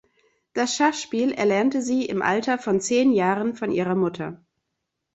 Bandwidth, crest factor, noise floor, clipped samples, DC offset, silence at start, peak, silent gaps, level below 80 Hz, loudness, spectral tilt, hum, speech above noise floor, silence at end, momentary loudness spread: 8.2 kHz; 18 dB; -80 dBFS; under 0.1%; under 0.1%; 0.55 s; -6 dBFS; none; -64 dBFS; -23 LUFS; -4.5 dB/octave; none; 58 dB; 0.8 s; 7 LU